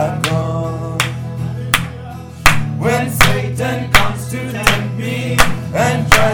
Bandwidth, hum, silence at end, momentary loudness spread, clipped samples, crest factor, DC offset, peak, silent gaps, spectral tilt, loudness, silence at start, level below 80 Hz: over 20 kHz; none; 0 s; 10 LU; 0.4%; 16 dB; under 0.1%; 0 dBFS; none; -4 dB/octave; -16 LUFS; 0 s; -28 dBFS